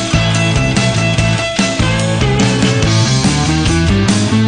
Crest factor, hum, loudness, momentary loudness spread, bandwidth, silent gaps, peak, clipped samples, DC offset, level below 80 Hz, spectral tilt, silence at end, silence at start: 12 dB; none; -12 LUFS; 2 LU; 10 kHz; none; 0 dBFS; under 0.1%; under 0.1%; -26 dBFS; -5 dB/octave; 0 s; 0 s